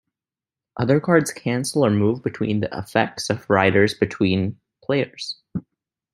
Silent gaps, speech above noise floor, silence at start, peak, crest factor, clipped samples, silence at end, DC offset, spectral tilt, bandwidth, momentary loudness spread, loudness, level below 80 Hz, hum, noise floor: none; over 70 dB; 0.75 s; -2 dBFS; 20 dB; under 0.1%; 0.55 s; under 0.1%; -5.5 dB/octave; 15 kHz; 14 LU; -21 LUFS; -58 dBFS; none; under -90 dBFS